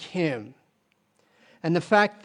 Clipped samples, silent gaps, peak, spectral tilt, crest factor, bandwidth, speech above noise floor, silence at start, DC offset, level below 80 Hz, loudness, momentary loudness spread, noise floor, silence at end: under 0.1%; none; -4 dBFS; -6 dB/octave; 22 dB; 10.5 kHz; 45 dB; 0 s; under 0.1%; -74 dBFS; -25 LUFS; 15 LU; -70 dBFS; 0.1 s